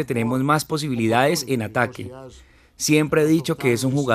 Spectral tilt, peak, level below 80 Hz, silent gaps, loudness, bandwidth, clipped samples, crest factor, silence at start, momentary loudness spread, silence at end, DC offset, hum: -5 dB/octave; -2 dBFS; -54 dBFS; none; -21 LUFS; 15.5 kHz; under 0.1%; 20 dB; 0 s; 8 LU; 0 s; under 0.1%; none